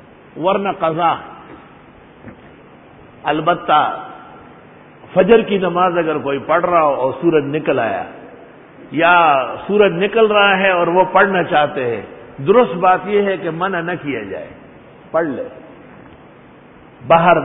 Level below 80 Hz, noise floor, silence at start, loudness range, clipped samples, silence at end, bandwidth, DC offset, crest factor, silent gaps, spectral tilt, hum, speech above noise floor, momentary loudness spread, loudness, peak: -54 dBFS; -42 dBFS; 0.35 s; 8 LU; under 0.1%; 0 s; 4 kHz; under 0.1%; 16 dB; none; -10 dB/octave; none; 28 dB; 14 LU; -15 LUFS; 0 dBFS